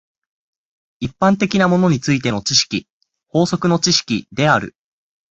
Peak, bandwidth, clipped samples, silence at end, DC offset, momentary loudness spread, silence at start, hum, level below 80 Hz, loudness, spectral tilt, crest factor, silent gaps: 0 dBFS; 8.2 kHz; under 0.1%; 0.6 s; under 0.1%; 10 LU; 1 s; none; -50 dBFS; -16 LUFS; -4.5 dB/octave; 18 dB; 2.90-3.01 s